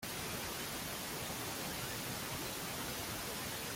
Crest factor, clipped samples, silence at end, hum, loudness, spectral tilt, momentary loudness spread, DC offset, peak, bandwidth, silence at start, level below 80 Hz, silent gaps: 14 dB; under 0.1%; 0 s; none; -40 LUFS; -2.5 dB/octave; 1 LU; under 0.1%; -28 dBFS; 17 kHz; 0 s; -60 dBFS; none